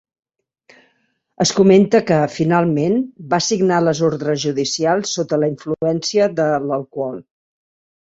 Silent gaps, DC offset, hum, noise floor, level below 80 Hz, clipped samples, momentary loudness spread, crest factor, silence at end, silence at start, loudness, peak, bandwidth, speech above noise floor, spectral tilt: none; under 0.1%; none; -65 dBFS; -58 dBFS; under 0.1%; 9 LU; 16 dB; 0.9 s; 1.4 s; -17 LUFS; -2 dBFS; 8.2 kHz; 49 dB; -5 dB/octave